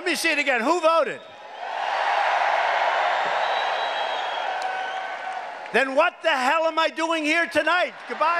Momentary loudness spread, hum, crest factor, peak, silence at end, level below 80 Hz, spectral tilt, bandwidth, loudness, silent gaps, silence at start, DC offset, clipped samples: 10 LU; none; 18 dB; -6 dBFS; 0 s; -76 dBFS; -1.5 dB/octave; 15 kHz; -23 LUFS; none; 0 s; under 0.1%; under 0.1%